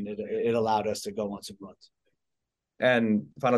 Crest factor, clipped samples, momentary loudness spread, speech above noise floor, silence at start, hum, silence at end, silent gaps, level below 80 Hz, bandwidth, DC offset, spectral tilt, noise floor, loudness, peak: 18 dB; under 0.1%; 18 LU; 58 dB; 0 s; none; 0 s; none; -68 dBFS; 12.5 kHz; under 0.1%; -5.5 dB/octave; -85 dBFS; -28 LUFS; -10 dBFS